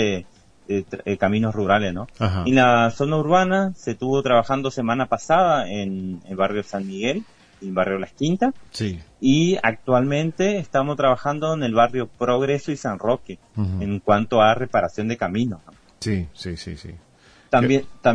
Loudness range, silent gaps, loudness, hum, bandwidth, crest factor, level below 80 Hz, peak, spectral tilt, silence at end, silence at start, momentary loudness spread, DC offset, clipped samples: 5 LU; none; -21 LUFS; none; 10.5 kHz; 18 dB; -50 dBFS; -2 dBFS; -6 dB/octave; 0 s; 0 s; 11 LU; under 0.1%; under 0.1%